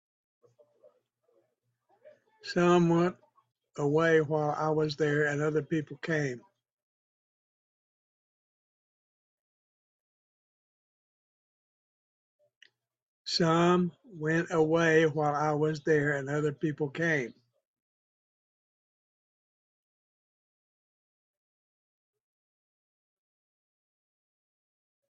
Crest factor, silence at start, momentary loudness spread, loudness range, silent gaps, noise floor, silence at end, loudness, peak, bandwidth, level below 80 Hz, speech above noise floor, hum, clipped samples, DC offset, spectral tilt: 22 dB; 2.45 s; 10 LU; 10 LU; 6.72-12.39 s, 12.56-12.61 s, 13.02-13.25 s; -78 dBFS; 7.8 s; -28 LUFS; -12 dBFS; 8 kHz; -72 dBFS; 51 dB; none; under 0.1%; under 0.1%; -6 dB/octave